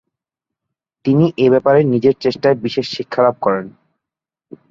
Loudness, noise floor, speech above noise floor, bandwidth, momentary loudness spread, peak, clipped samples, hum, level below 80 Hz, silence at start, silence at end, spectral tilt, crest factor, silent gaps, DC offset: -15 LUFS; -85 dBFS; 71 dB; 7.4 kHz; 9 LU; -2 dBFS; under 0.1%; none; -58 dBFS; 1.05 s; 1 s; -8 dB/octave; 16 dB; none; under 0.1%